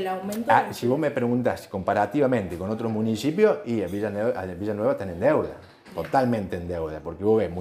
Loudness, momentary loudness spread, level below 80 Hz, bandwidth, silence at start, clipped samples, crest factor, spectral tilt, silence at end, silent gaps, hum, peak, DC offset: -25 LUFS; 9 LU; -54 dBFS; 15.5 kHz; 0 s; under 0.1%; 20 dB; -7 dB/octave; 0 s; none; none; -6 dBFS; under 0.1%